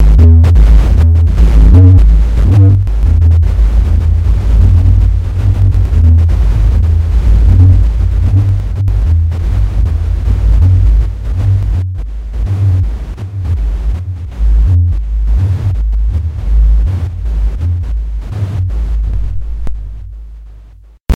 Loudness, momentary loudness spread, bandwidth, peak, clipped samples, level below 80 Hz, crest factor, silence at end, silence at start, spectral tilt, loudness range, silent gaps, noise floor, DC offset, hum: -11 LUFS; 13 LU; 4.6 kHz; 0 dBFS; 0.8%; -10 dBFS; 8 dB; 0 s; 0 s; -9 dB/octave; 8 LU; none; -36 dBFS; under 0.1%; none